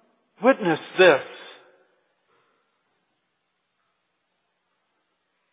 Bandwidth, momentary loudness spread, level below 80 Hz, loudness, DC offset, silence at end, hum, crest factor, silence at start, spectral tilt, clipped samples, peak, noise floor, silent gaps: 4 kHz; 20 LU; -86 dBFS; -20 LUFS; under 0.1%; 4.3 s; none; 24 dB; 0.4 s; -9 dB/octave; under 0.1%; -2 dBFS; -75 dBFS; none